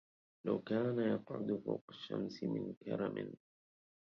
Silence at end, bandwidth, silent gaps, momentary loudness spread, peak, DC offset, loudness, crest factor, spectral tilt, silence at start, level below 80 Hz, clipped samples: 0.7 s; 6.8 kHz; 1.81-1.88 s, 2.77-2.81 s; 10 LU; -22 dBFS; under 0.1%; -40 LUFS; 18 dB; -6.5 dB/octave; 0.45 s; -78 dBFS; under 0.1%